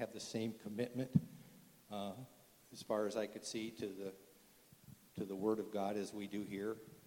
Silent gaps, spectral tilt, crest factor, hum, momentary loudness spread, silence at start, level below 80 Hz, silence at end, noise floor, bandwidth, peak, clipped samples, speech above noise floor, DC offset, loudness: none; -6 dB/octave; 26 dB; none; 21 LU; 0 s; -76 dBFS; 0 s; -66 dBFS; 19 kHz; -18 dBFS; under 0.1%; 24 dB; under 0.1%; -43 LUFS